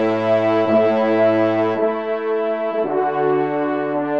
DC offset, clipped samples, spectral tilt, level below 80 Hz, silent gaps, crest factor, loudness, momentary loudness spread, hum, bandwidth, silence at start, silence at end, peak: 0.3%; under 0.1%; -8 dB/octave; -68 dBFS; none; 12 dB; -18 LUFS; 5 LU; none; 7 kHz; 0 s; 0 s; -6 dBFS